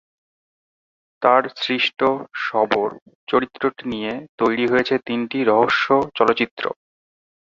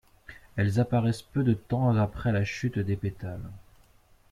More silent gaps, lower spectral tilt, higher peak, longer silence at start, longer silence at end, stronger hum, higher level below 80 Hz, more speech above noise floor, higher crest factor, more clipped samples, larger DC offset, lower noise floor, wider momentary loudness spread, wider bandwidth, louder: first, 3.02-3.06 s, 3.15-3.27 s, 4.29-4.38 s, 6.51-6.57 s vs none; second, -5.5 dB/octave vs -8 dB/octave; first, -2 dBFS vs -12 dBFS; first, 1.2 s vs 0.3 s; first, 0.85 s vs 0.7 s; neither; second, -62 dBFS vs -52 dBFS; first, over 70 dB vs 33 dB; about the same, 20 dB vs 16 dB; neither; neither; first, under -90 dBFS vs -60 dBFS; second, 10 LU vs 13 LU; second, 7.6 kHz vs 12.5 kHz; first, -20 LUFS vs -28 LUFS